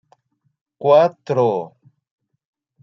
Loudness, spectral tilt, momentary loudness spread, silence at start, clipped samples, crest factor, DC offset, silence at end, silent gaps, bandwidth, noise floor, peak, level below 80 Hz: -17 LUFS; -7.5 dB/octave; 12 LU; 0.8 s; under 0.1%; 18 dB; under 0.1%; 1.15 s; none; 6.4 kHz; -60 dBFS; -2 dBFS; -74 dBFS